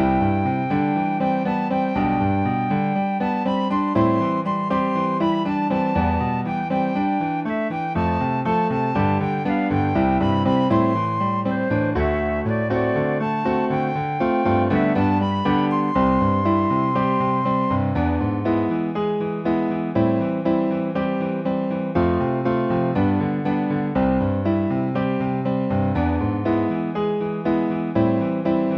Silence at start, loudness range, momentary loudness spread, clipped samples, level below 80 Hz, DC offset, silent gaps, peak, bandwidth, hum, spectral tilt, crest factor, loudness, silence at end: 0 s; 2 LU; 4 LU; under 0.1%; -40 dBFS; under 0.1%; none; -6 dBFS; 6.6 kHz; none; -9.5 dB/octave; 14 dB; -21 LUFS; 0 s